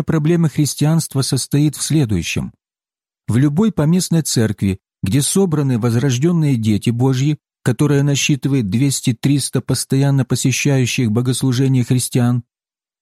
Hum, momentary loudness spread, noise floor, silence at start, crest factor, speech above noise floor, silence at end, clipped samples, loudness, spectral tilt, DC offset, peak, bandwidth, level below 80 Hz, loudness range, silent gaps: none; 5 LU; under -90 dBFS; 0 s; 12 dB; over 74 dB; 0.6 s; under 0.1%; -16 LUFS; -5.5 dB/octave; under 0.1%; -4 dBFS; 15 kHz; -48 dBFS; 2 LU; none